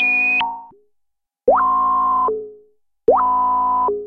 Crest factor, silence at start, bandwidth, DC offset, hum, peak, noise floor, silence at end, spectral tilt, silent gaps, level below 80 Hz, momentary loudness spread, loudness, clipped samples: 16 dB; 0 s; 5.4 kHz; under 0.1%; none; -2 dBFS; -72 dBFS; 0 s; -5.5 dB/octave; none; -50 dBFS; 11 LU; -17 LUFS; under 0.1%